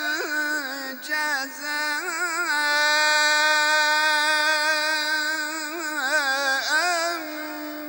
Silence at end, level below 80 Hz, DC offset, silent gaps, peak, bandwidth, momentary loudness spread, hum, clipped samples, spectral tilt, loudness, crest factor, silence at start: 0 s; -82 dBFS; under 0.1%; none; -6 dBFS; 16.5 kHz; 10 LU; none; under 0.1%; 2.5 dB/octave; -22 LUFS; 16 dB; 0 s